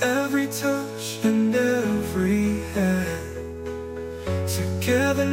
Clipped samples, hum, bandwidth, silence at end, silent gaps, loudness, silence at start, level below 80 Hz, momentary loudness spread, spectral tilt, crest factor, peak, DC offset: under 0.1%; none; 16.5 kHz; 0 s; none; -24 LUFS; 0 s; -48 dBFS; 12 LU; -5.5 dB/octave; 16 dB; -8 dBFS; under 0.1%